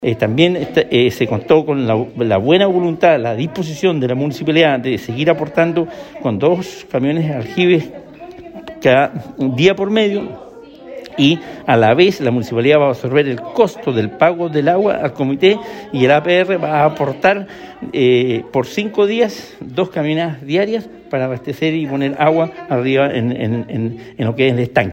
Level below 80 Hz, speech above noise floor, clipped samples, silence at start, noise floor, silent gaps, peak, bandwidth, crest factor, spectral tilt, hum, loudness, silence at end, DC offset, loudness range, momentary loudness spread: -54 dBFS; 20 dB; under 0.1%; 0 s; -35 dBFS; none; 0 dBFS; 16.5 kHz; 14 dB; -6.5 dB/octave; none; -15 LUFS; 0 s; under 0.1%; 3 LU; 10 LU